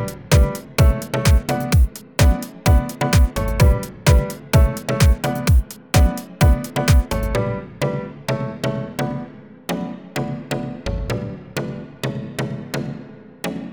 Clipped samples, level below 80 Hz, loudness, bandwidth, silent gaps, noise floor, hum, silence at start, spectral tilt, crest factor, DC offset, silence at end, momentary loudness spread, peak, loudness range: under 0.1%; -22 dBFS; -20 LUFS; over 20 kHz; none; -38 dBFS; none; 0 s; -6 dB/octave; 18 dB; 0.1%; 0 s; 11 LU; -2 dBFS; 9 LU